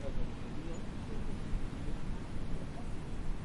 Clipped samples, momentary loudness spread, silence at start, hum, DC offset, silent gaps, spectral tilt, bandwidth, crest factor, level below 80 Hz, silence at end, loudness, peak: under 0.1%; 2 LU; 0 s; none; under 0.1%; none; -6.5 dB/octave; 11 kHz; 12 dB; -40 dBFS; 0 s; -43 LUFS; -22 dBFS